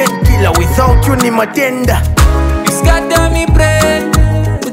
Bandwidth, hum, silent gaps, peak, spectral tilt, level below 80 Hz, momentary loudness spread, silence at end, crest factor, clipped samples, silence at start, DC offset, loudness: 16.5 kHz; none; none; 0 dBFS; -5.5 dB/octave; -14 dBFS; 3 LU; 0 s; 10 dB; under 0.1%; 0 s; under 0.1%; -11 LUFS